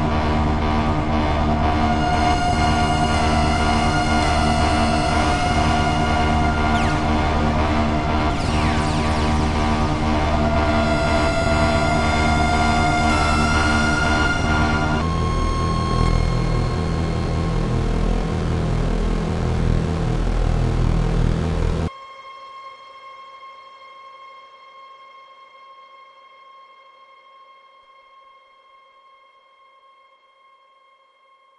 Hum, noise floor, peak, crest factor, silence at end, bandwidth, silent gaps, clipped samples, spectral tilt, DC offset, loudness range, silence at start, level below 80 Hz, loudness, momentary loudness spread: none; -55 dBFS; -6 dBFS; 14 dB; 5.85 s; 11.5 kHz; none; under 0.1%; -6 dB/octave; under 0.1%; 6 LU; 0 s; -26 dBFS; -20 LUFS; 5 LU